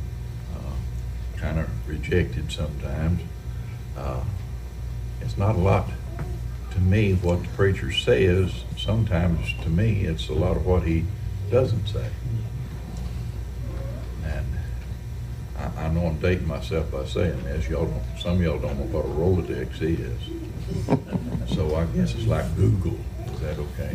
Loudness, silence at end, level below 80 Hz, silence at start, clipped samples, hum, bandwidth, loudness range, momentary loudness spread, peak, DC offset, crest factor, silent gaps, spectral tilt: -26 LUFS; 0 s; -32 dBFS; 0 s; under 0.1%; none; 15.5 kHz; 6 LU; 11 LU; -8 dBFS; under 0.1%; 18 dB; none; -7 dB/octave